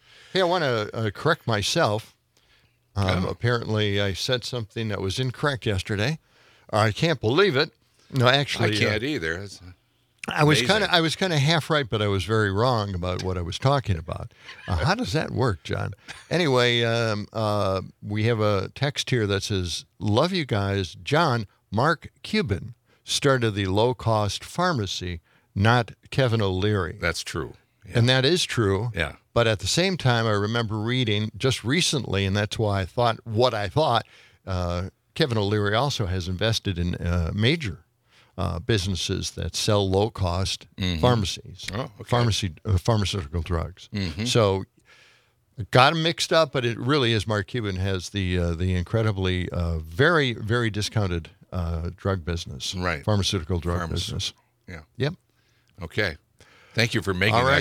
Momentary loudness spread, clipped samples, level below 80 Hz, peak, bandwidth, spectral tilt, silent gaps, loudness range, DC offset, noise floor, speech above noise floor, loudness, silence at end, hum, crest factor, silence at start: 10 LU; under 0.1%; -48 dBFS; 0 dBFS; 15 kHz; -5 dB/octave; none; 4 LU; under 0.1%; -64 dBFS; 40 dB; -24 LUFS; 0 s; none; 24 dB; 0.35 s